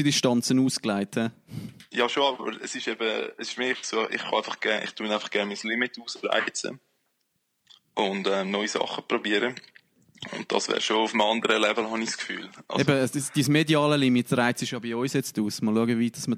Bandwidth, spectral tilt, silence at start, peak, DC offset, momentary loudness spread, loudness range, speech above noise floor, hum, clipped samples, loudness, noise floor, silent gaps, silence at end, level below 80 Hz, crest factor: 15.5 kHz; -4 dB/octave; 0 s; -8 dBFS; under 0.1%; 10 LU; 5 LU; 49 dB; none; under 0.1%; -26 LUFS; -75 dBFS; none; 0 s; -72 dBFS; 18 dB